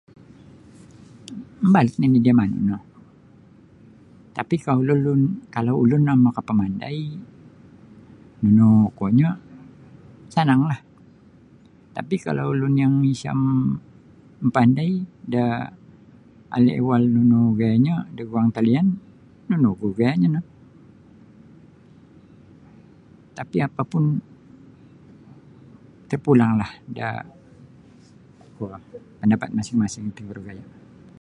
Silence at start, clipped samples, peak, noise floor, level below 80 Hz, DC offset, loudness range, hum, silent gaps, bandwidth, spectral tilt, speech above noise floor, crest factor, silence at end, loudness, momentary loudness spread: 1.3 s; under 0.1%; -2 dBFS; -51 dBFS; -56 dBFS; under 0.1%; 8 LU; none; none; 9.8 kHz; -8.5 dB/octave; 31 dB; 20 dB; 0.55 s; -21 LUFS; 18 LU